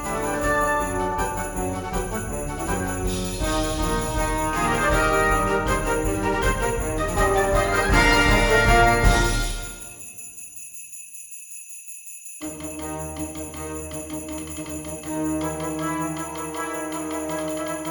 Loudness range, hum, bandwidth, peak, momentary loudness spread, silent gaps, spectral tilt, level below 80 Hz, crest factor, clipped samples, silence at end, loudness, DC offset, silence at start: 14 LU; none; 19 kHz; -4 dBFS; 18 LU; none; -4 dB/octave; -30 dBFS; 20 dB; under 0.1%; 0 s; -23 LUFS; under 0.1%; 0 s